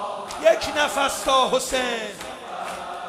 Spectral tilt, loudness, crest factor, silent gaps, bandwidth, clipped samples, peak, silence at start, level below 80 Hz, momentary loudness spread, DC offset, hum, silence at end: -1.5 dB/octave; -22 LUFS; 20 dB; none; 15.5 kHz; under 0.1%; -4 dBFS; 0 s; -52 dBFS; 13 LU; under 0.1%; none; 0 s